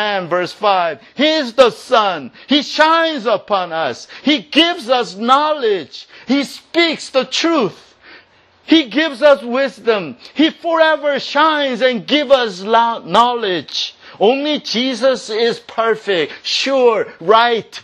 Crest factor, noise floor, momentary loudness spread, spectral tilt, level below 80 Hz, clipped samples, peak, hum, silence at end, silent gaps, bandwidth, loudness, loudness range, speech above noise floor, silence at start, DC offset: 16 dB; -49 dBFS; 7 LU; -3.5 dB/octave; -64 dBFS; under 0.1%; 0 dBFS; none; 0.05 s; none; 12.5 kHz; -15 LUFS; 2 LU; 34 dB; 0 s; under 0.1%